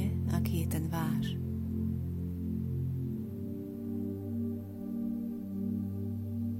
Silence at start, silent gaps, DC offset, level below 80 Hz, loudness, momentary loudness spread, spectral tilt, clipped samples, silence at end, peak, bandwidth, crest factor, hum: 0 s; none; under 0.1%; -50 dBFS; -36 LUFS; 7 LU; -7.5 dB/octave; under 0.1%; 0 s; -20 dBFS; 16.5 kHz; 14 dB; none